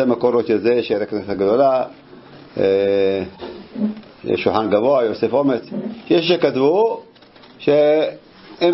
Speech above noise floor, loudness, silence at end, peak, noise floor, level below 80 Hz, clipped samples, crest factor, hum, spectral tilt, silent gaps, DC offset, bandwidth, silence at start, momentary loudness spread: 28 dB; -18 LUFS; 0 s; -2 dBFS; -45 dBFS; -58 dBFS; under 0.1%; 16 dB; none; -9.5 dB/octave; none; under 0.1%; 5.8 kHz; 0 s; 13 LU